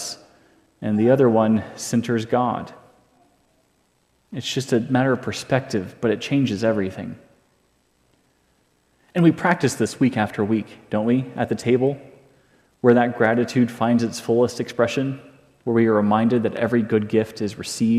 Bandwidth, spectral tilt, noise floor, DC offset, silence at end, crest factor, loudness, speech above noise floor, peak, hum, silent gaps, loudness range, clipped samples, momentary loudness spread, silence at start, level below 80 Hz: 14 kHz; -6 dB/octave; -64 dBFS; under 0.1%; 0 s; 18 dB; -21 LUFS; 44 dB; -2 dBFS; none; none; 5 LU; under 0.1%; 11 LU; 0 s; -64 dBFS